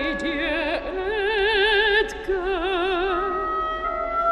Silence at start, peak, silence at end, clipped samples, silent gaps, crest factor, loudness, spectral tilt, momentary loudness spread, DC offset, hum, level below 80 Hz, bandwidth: 0 s; -8 dBFS; 0 s; under 0.1%; none; 14 dB; -22 LUFS; -4 dB/octave; 8 LU; under 0.1%; none; -40 dBFS; 11 kHz